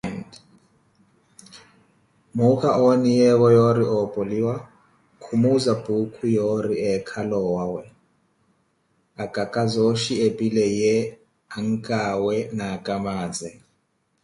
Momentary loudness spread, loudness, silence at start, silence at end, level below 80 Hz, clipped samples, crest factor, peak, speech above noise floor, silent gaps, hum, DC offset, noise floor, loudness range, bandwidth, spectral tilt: 15 LU; -22 LUFS; 0.05 s; 0.7 s; -58 dBFS; under 0.1%; 16 dB; -6 dBFS; 48 dB; none; none; under 0.1%; -69 dBFS; 7 LU; 11.5 kHz; -6.5 dB/octave